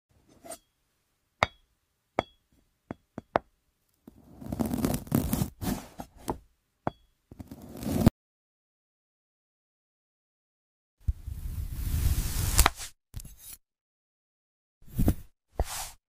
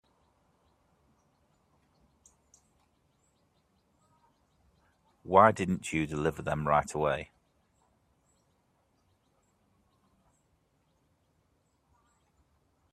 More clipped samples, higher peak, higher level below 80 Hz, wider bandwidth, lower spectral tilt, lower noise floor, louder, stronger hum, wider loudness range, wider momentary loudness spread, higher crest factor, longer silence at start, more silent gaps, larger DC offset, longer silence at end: neither; about the same, -6 dBFS vs -6 dBFS; first, -38 dBFS vs -62 dBFS; first, 16 kHz vs 14 kHz; second, -4.5 dB/octave vs -6 dB/octave; about the same, -75 dBFS vs -73 dBFS; second, -31 LUFS vs -28 LUFS; neither; about the same, 7 LU vs 7 LU; first, 20 LU vs 11 LU; about the same, 28 dB vs 28 dB; second, 0.45 s vs 5.25 s; first, 8.11-10.97 s, 13.81-14.81 s vs none; neither; second, 0.2 s vs 5.7 s